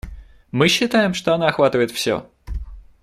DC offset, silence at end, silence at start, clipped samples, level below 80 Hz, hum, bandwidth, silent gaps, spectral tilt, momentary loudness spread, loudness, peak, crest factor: under 0.1%; 0.2 s; 0.05 s; under 0.1%; -36 dBFS; none; 16 kHz; none; -4.5 dB/octave; 17 LU; -18 LUFS; -2 dBFS; 18 dB